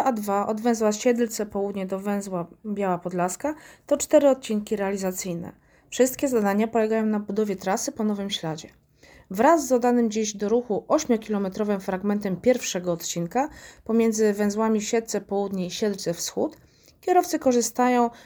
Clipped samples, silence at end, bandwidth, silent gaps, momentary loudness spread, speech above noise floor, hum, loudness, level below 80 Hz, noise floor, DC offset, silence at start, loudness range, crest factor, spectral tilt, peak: under 0.1%; 0.05 s; over 20 kHz; none; 10 LU; 30 dB; none; -24 LUFS; -60 dBFS; -54 dBFS; under 0.1%; 0 s; 2 LU; 18 dB; -4.5 dB/octave; -6 dBFS